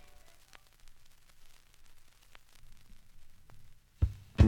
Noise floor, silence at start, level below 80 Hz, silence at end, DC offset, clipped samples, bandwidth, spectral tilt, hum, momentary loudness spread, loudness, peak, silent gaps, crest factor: -58 dBFS; 3.2 s; -40 dBFS; 0 s; under 0.1%; under 0.1%; 12 kHz; -8 dB/octave; none; 28 LU; -36 LUFS; -10 dBFS; none; 26 dB